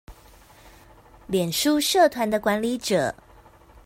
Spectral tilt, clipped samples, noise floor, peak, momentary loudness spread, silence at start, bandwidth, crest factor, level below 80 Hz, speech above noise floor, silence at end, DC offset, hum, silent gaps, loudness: -3.5 dB/octave; under 0.1%; -51 dBFS; -8 dBFS; 9 LU; 0.1 s; 16.5 kHz; 18 dB; -54 dBFS; 29 dB; 0.75 s; under 0.1%; none; none; -22 LUFS